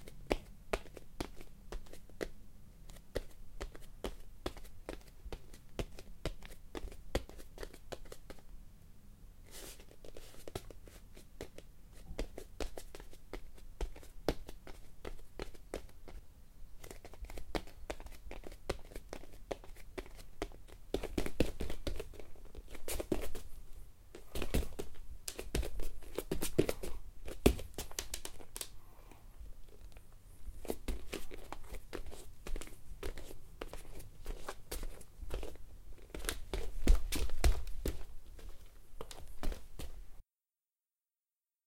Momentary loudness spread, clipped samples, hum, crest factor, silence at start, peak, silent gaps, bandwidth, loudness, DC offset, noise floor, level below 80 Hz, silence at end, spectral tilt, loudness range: 19 LU; under 0.1%; none; 30 dB; 0 s; -10 dBFS; none; 16.5 kHz; -44 LUFS; under 0.1%; under -90 dBFS; -44 dBFS; 1.45 s; -4.5 dB/octave; 11 LU